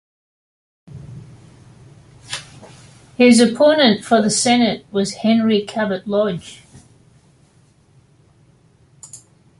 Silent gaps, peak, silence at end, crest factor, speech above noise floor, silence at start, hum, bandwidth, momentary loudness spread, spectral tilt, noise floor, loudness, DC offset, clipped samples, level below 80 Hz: none; -2 dBFS; 0.45 s; 18 dB; 38 dB; 0.95 s; none; 11.5 kHz; 26 LU; -4 dB/octave; -54 dBFS; -15 LUFS; under 0.1%; under 0.1%; -56 dBFS